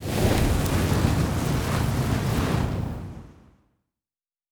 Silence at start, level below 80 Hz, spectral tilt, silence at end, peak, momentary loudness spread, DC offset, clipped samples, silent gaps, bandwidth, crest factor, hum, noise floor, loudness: 0 s; -32 dBFS; -6 dB/octave; 1.2 s; -8 dBFS; 10 LU; under 0.1%; under 0.1%; none; over 20 kHz; 18 dB; none; under -90 dBFS; -24 LUFS